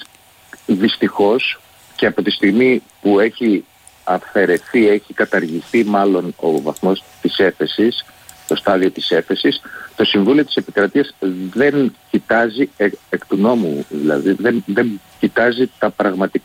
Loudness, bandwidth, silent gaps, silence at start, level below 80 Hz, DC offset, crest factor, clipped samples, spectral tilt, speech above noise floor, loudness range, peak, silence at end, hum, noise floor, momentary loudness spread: -16 LUFS; 16 kHz; none; 0 s; -58 dBFS; under 0.1%; 14 dB; under 0.1%; -5.5 dB/octave; 31 dB; 2 LU; -2 dBFS; 0.05 s; none; -47 dBFS; 7 LU